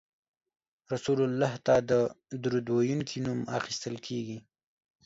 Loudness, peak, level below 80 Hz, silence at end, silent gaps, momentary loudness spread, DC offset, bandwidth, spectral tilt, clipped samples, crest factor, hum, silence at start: -30 LUFS; -12 dBFS; -64 dBFS; 0.65 s; none; 11 LU; under 0.1%; 8 kHz; -6 dB/octave; under 0.1%; 18 dB; none; 0.9 s